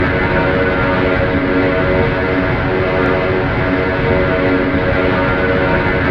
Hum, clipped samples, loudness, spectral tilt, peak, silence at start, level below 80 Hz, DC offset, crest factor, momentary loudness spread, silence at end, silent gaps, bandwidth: none; under 0.1%; -14 LUFS; -8.5 dB/octave; -2 dBFS; 0 s; -26 dBFS; 0.5%; 12 dB; 1 LU; 0 s; none; 6.2 kHz